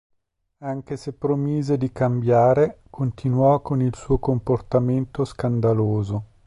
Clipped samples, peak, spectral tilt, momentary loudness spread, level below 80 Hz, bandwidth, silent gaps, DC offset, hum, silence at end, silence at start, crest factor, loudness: under 0.1%; -6 dBFS; -9 dB/octave; 11 LU; -44 dBFS; 10.5 kHz; none; under 0.1%; none; 0.2 s; 0.6 s; 14 dB; -22 LUFS